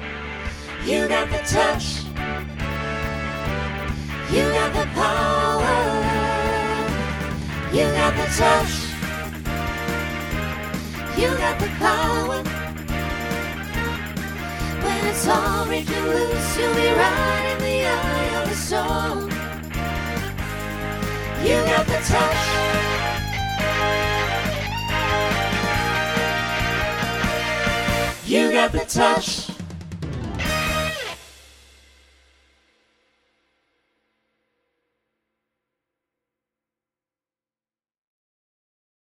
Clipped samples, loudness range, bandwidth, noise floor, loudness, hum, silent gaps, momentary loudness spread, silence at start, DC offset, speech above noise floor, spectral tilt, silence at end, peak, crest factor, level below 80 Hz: under 0.1%; 4 LU; 19.5 kHz; under -90 dBFS; -22 LUFS; none; none; 10 LU; 0 s; under 0.1%; over 70 dB; -4.5 dB/octave; 7.65 s; -4 dBFS; 20 dB; -34 dBFS